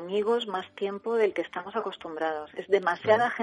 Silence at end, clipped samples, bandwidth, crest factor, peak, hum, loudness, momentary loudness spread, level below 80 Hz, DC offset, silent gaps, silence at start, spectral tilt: 0 s; under 0.1%; 10.5 kHz; 18 dB; -8 dBFS; none; -28 LUFS; 10 LU; -72 dBFS; under 0.1%; none; 0 s; -5.5 dB/octave